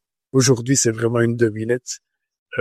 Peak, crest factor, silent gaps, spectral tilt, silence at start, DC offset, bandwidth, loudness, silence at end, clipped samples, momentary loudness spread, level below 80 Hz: -4 dBFS; 16 dB; 2.39-2.46 s; -4.5 dB/octave; 0.35 s; under 0.1%; 14 kHz; -19 LUFS; 0 s; under 0.1%; 13 LU; -58 dBFS